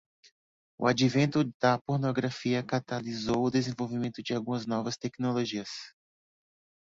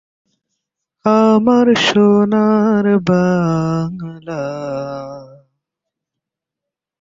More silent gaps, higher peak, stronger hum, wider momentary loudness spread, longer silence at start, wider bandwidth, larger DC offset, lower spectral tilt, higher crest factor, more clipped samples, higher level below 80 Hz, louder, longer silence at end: first, 1.54-1.60 s, 1.81-1.85 s vs none; second, -10 dBFS vs -2 dBFS; neither; second, 9 LU vs 15 LU; second, 0.8 s vs 1.05 s; about the same, 7.8 kHz vs 7.6 kHz; neither; about the same, -6 dB/octave vs -6.5 dB/octave; first, 20 dB vs 14 dB; neither; second, -64 dBFS vs -52 dBFS; second, -30 LUFS vs -14 LUFS; second, 0.95 s vs 1.75 s